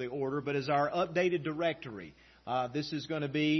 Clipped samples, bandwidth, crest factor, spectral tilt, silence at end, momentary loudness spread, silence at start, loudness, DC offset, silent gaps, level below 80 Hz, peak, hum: under 0.1%; 6.2 kHz; 16 dB; -4.5 dB/octave; 0 s; 14 LU; 0 s; -33 LUFS; under 0.1%; none; -68 dBFS; -16 dBFS; none